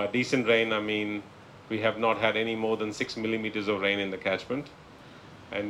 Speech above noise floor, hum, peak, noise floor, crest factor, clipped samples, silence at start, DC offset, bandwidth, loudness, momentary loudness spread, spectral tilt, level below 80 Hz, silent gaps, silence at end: 21 dB; none; -10 dBFS; -49 dBFS; 18 dB; under 0.1%; 0 s; under 0.1%; 12.5 kHz; -28 LUFS; 15 LU; -5 dB/octave; -64 dBFS; none; 0 s